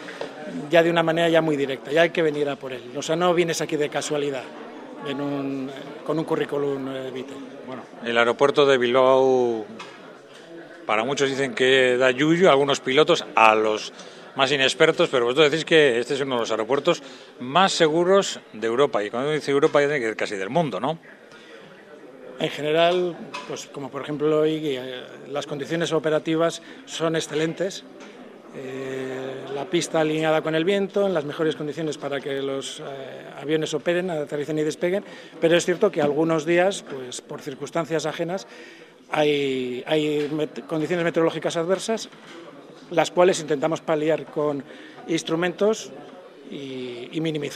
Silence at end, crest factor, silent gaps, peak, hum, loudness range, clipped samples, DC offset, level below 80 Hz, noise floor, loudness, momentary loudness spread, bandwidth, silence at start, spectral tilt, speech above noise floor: 0 s; 22 dB; none; 0 dBFS; none; 8 LU; under 0.1%; under 0.1%; -72 dBFS; -45 dBFS; -22 LUFS; 17 LU; 14.5 kHz; 0 s; -4.5 dB/octave; 22 dB